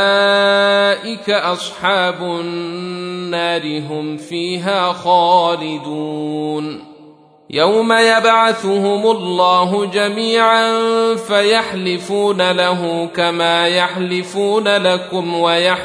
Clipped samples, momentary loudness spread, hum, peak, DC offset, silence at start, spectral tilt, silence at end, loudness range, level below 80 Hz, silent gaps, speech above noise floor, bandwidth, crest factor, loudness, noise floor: under 0.1%; 11 LU; none; -2 dBFS; under 0.1%; 0 s; -4 dB/octave; 0 s; 5 LU; -64 dBFS; none; 29 dB; 11 kHz; 14 dB; -15 LUFS; -44 dBFS